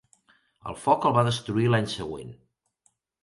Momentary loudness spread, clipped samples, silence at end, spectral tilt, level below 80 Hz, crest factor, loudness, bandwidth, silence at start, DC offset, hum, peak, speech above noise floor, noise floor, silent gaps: 18 LU; under 0.1%; 0.9 s; -6 dB/octave; -58 dBFS; 20 dB; -25 LUFS; 11.5 kHz; 0.65 s; under 0.1%; none; -6 dBFS; 45 dB; -70 dBFS; none